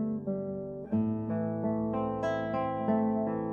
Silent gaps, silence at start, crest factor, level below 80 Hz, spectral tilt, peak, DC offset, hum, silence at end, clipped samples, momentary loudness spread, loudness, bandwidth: none; 0 s; 14 dB; -58 dBFS; -9.5 dB/octave; -16 dBFS; under 0.1%; none; 0 s; under 0.1%; 6 LU; -32 LUFS; 7 kHz